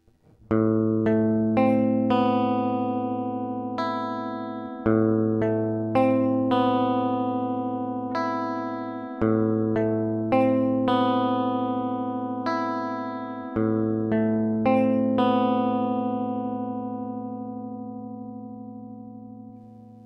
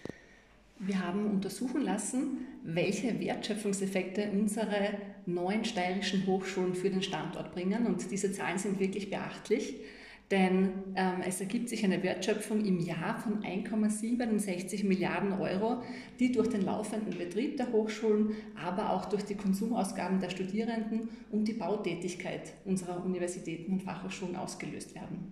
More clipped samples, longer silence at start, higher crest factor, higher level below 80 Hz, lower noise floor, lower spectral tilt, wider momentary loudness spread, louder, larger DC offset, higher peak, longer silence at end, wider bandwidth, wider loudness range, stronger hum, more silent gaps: neither; first, 0.5 s vs 0 s; about the same, 16 dB vs 16 dB; first, -58 dBFS vs -66 dBFS; second, -56 dBFS vs -60 dBFS; first, -9 dB/octave vs -5.5 dB/octave; first, 13 LU vs 8 LU; first, -25 LUFS vs -33 LUFS; neither; first, -8 dBFS vs -16 dBFS; about the same, 0 s vs 0 s; second, 6.2 kHz vs 14 kHz; about the same, 4 LU vs 3 LU; neither; neither